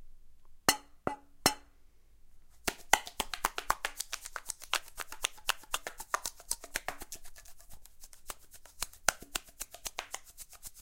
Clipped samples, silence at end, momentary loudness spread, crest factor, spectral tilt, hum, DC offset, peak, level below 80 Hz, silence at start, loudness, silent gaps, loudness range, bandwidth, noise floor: under 0.1%; 0 s; 17 LU; 34 dB; -0.5 dB/octave; none; under 0.1%; -4 dBFS; -54 dBFS; 0 s; -35 LUFS; none; 6 LU; 17 kHz; -58 dBFS